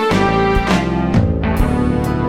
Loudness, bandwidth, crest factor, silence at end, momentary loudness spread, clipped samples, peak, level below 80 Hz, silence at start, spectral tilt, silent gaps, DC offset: -16 LUFS; 16 kHz; 14 dB; 0 s; 3 LU; under 0.1%; 0 dBFS; -24 dBFS; 0 s; -7 dB/octave; none; under 0.1%